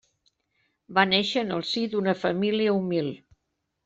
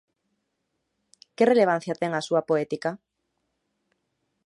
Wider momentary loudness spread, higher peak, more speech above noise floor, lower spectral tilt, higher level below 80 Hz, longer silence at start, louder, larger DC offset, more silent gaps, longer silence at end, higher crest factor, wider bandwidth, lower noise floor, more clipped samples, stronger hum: second, 7 LU vs 11 LU; first, -4 dBFS vs -8 dBFS; about the same, 54 dB vs 55 dB; about the same, -5.5 dB/octave vs -6 dB/octave; first, -68 dBFS vs -78 dBFS; second, 0.9 s vs 1.4 s; about the same, -25 LUFS vs -24 LUFS; neither; neither; second, 0.7 s vs 1.5 s; about the same, 22 dB vs 20 dB; second, 8 kHz vs 11.5 kHz; about the same, -79 dBFS vs -78 dBFS; neither; neither